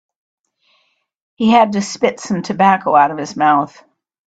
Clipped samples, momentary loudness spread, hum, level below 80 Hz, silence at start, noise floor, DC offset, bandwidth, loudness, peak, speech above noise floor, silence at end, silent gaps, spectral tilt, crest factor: under 0.1%; 8 LU; none; -60 dBFS; 1.4 s; -62 dBFS; under 0.1%; 9 kHz; -15 LUFS; 0 dBFS; 48 dB; 0.6 s; none; -5 dB/octave; 16 dB